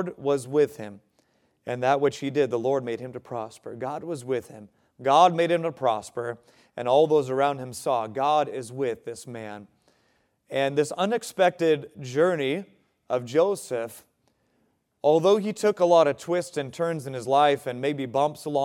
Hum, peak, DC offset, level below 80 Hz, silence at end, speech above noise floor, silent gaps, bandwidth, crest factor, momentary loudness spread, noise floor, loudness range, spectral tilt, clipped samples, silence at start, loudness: none; -4 dBFS; under 0.1%; -74 dBFS; 0 s; 45 dB; none; 16 kHz; 20 dB; 15 LU; -70 dBFS; 5 LU; -5.5 dB/octave; under 0.1%; 0 s; -25 LUFS